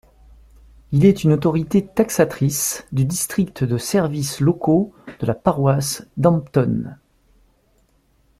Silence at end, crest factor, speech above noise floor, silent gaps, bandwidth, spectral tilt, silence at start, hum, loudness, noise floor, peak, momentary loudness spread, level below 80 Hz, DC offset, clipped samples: 1.45 s; 18 dB; 42 dB; none; 16 kHz; -6 dB/octave; 0.9 s; none; -19 LUFS; -60 dBFS; -2 dBFS; 7 LU; -48 dBFS; under 0.1%; under 0.1%